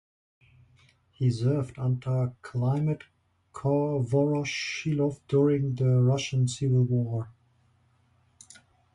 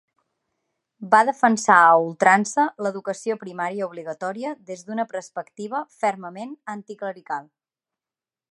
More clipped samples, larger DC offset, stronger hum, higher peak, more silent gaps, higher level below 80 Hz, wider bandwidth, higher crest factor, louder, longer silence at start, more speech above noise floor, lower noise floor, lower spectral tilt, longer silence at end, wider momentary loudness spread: neither; neither; neither; second, -12 dBFS vs 0 dBFS; neither; first, -60 dBFS vs -78 dBFS; about the same, 10.5 kHz vs 11.5 kHz; second, 16 dB vs 22 dB; second, -27 LUFS vs -21 LUFS; first, 1.2 s vs 1 s; second, 40 dB vs over 68 dB; second, -66 dBFS vs under -90 dBFS; first, -7 dB/octave vs -4.5 dB/octave; first, 1.65 s vs 1.1 s; second, 8 LU vs 18 LU